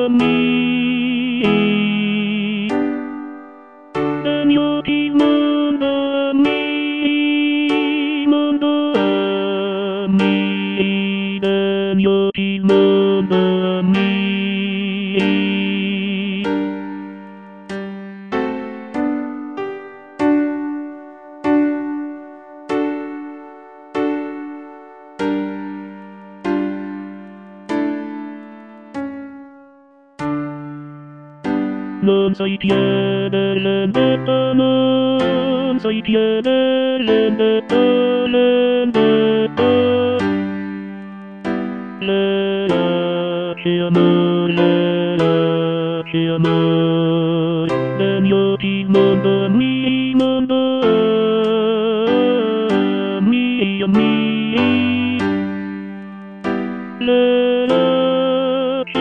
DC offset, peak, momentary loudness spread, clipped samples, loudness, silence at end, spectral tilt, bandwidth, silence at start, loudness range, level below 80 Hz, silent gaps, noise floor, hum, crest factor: under 0.1%; -2 dBFS; 15 LU; under 0.1%; -17 LUFS; 0 s; -8 dB/octave; 8.6 kHz; 0 s; 10 LU; -56 dBFS; none; -48 dBFS; none; 14 dB